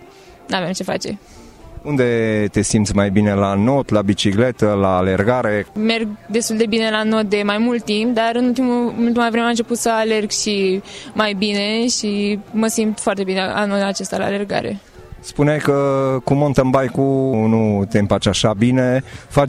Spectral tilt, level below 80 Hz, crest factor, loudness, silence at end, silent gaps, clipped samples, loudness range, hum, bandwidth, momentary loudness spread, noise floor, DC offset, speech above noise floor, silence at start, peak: -5 dB/octave; -42 dBFS; 14 dB; -17 LUFS; 0 s; none; under 0.1%; 3 LU; none; 14 kHz; 6 LU; -40 dBFS; under 0.1%; 23 dB; 0 s; -2 dBFS